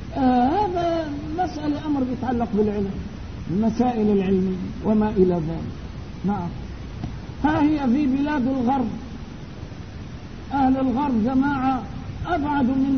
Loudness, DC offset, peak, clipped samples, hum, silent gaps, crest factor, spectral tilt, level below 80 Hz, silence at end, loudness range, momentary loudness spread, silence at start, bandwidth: -23 LUFS; 0.5%; -6 dBFS; under 0.1%; none; none; 16 dB; -8 dB/octave; -40 dBFS; 0 s; 2 LU; 16 LU; 0 s; 6.6 kHz